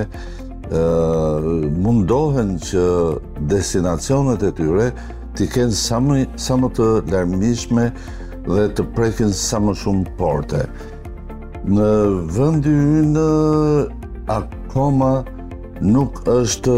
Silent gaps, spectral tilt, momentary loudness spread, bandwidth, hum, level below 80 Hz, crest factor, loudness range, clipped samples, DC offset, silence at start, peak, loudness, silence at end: none; -6.5 dB/octave; 14 LU; 16 kHz; none; -32 dBFS; 12 dB; 3 LU; under 0.1%; 0.5%; 0 s; -6 dBFS; -18 LUFS; 0 s